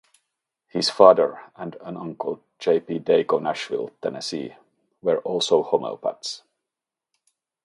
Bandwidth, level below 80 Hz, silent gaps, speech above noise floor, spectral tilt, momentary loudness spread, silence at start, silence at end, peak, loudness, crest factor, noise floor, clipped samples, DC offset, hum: 11.5 kHz; -72 dBFS; none; 65 dB; -4.5 dB/octave; 19 LU; 0.75 s; 1.3 s; 0 dBFS; -22 LUFS; 24 dB; -87 dBFS; under 0.1%; under 0.1%; none